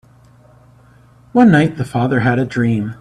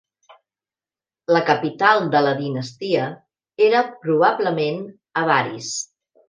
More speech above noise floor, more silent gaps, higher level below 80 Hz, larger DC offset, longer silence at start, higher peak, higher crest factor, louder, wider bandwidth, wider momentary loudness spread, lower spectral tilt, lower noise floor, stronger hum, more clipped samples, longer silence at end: second, 33 dB vs over 71 dB; neither; first, -48 dBFS vs -72 dBFS; neither; about the same, 1.35 s vs 1.3 s; about the same, 0 dBFS vs 0 dBFS; about the same, 16 dB vs 20 dB; first, -15 LUFS vs -20 LUFS; about the same, 11 kHz vs 10 kHz; second, 8 LU vs 11 LU; first, -8 dB/octave vs -4.5 dB/octave; second, -47 dBFS vs under -90 dBFS; neither; neither; second, 0.05 s vs 0.45 s